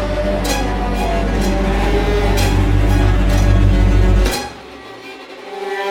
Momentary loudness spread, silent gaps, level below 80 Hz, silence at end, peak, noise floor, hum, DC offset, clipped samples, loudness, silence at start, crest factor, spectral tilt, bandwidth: 18 LU; none; -18 dBFS; 0 s; -2 dBFS; -34 dBFS; none; under 0.1%; under 0.1%; -16 LUFS; 0 s; 12 dB; -6 dB/octave; 16.5 kHz